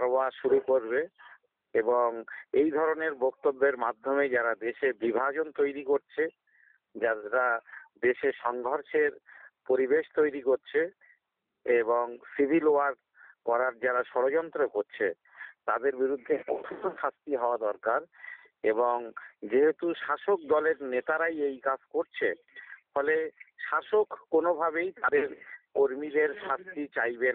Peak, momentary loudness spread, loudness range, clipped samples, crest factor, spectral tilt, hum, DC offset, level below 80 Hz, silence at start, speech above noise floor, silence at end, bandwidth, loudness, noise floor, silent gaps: -14 dBFS; 9 LU; 3 LU; under 0.1%; 16 dB; -3 dB/octave; none; under 0.1%; -76 dBFS; 0 s; 51 dB; 0 s; 4 kHz; -29 LUFS; -79 dBFS; none